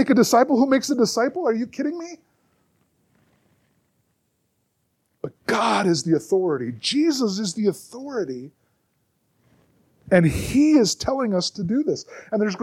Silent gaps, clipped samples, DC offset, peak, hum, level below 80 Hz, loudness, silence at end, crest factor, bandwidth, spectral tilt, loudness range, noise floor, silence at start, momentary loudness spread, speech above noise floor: none; under 0.1%; under 0.1%; -4 dBFS; none; -50 dBFS; -21 LUFS; 0 s; 20 dB; 15.5 kHz; -5 dB/octave; 9 LU; -71 dBFS; 0 s; 14 LU; 50 dB